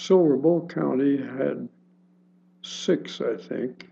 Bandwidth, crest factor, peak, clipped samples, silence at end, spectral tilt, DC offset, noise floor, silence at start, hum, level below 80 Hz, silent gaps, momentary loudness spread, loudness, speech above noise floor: 7.8 kHz; 18 dB; -8 dBFS; under 0.1%; 0.1 s; -6.5 dB/octave; under 0.1%; -59 dBFS; 0 s; none; -84 dBFS; none; 16 LU; -25 LUFS; 35 dB